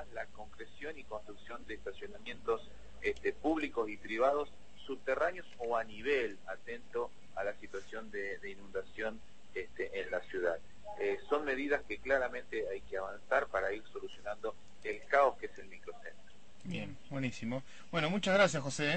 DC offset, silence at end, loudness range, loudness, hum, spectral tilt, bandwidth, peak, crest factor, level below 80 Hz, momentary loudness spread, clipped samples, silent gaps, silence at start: 0.5%; 0 s; 6 LU; -37 LUFS; none; -4.5 dB/octave; 8.4 kHz; -16 dBFS; 22 dB; -62 dBFS; 15 LU; under 0.1%; none; 0 s